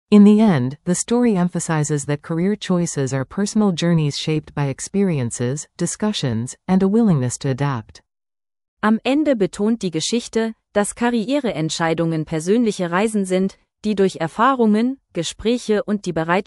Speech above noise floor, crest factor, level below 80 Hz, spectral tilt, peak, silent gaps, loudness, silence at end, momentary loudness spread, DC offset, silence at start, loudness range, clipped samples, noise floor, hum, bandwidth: over 72 dB; 16 dB; -52 dBFS; -5.5 dB/octave; -2 dBFS; 8.68-8.77 s; -19 LUFS; 0.05 s; 7 LU; under 0.1%; 0.1 s; 2 LU; under 0.1%; under -90 dBFS; none; 12 kHz